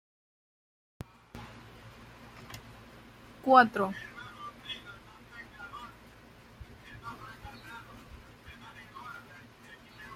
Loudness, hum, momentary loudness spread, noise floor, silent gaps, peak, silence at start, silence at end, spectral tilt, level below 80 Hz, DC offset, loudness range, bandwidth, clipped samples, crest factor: -28 LUFS; none; 21 LU; -55 dBFS; none; -6 dBFS; 1.35 s; 0 s; -5 dB/octave; -60 dBFS; under 0.1%; 18 LU; 16 kHz; under 0.1%; 30 dB